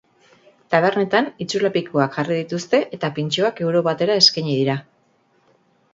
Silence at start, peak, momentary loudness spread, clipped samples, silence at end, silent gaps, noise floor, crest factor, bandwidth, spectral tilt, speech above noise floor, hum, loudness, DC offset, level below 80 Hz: 0.7 s; 0 dBFS; 10 LU; under 0.1%; 1.1 s; none; -61 dBFS; 20 dB; 7.8 kHz; -4.5 dB/octave; 42 dB; none; -19 LUFS; under 0.1%; -66 dBFS